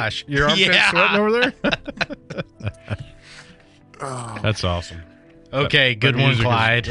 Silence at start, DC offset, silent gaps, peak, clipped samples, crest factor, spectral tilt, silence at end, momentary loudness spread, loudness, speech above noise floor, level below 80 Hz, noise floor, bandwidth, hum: 0 s; under 0.1%; none; -2 dBFS; under 0.1%; 18 dB; -5 dB/octave; 0 s; 19 LU; -18 LUFS; 29 dB; -44 dBFS; -48 dBFS; 11 kHz; none